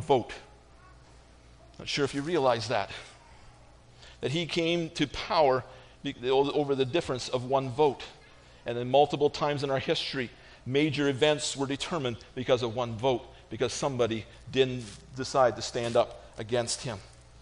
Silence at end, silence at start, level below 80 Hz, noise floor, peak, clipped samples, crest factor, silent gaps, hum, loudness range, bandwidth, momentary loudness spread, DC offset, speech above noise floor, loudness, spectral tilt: 0 s; 0 s; -56 dBFS; -54 dBFS; -10 dBFS; under 0.1%; 20 dB; none; none; 3 LU; 10.5 kHz; 13 LU; under 0.1%; 26 dB; -29 LUFS; -4.5 dB/octave